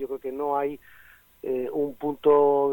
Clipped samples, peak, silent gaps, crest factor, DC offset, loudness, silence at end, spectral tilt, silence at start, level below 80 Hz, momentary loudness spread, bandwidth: under 0.1%; -8 dBFS; none; 16 dB; under 0.1%; -25 LUFS; 0 s; -8 dB/octave; 0 s; -64 dBFS; 13 LU; 17.5 kHz